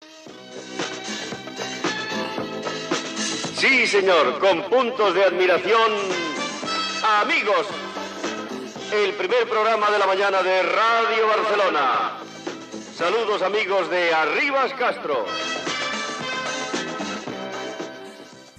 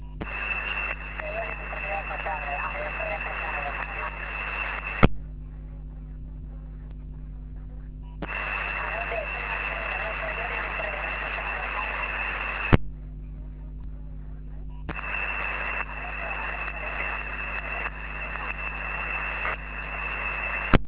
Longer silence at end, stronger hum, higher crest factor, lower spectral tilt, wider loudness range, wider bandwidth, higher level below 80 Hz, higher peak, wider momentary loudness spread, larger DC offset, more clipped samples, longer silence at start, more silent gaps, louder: about the same, 0.1 s vs 0 s; neither; second, 16 dB vs 30 dB; second, -2.5 dB/octave vs -4 dB/octave; first, 7 LU vs 4 LU; first, 12.5 kHz vs 4 kHz; second, -72 dBFS vs -36 dBFS; second, -8 dBFS vs 0 dBFS; about the same, 14 LU vs 14 LU; neither; neither; about the same, 0 s vs 0 s; neither; first, -21 LUFS vs -29 LUFS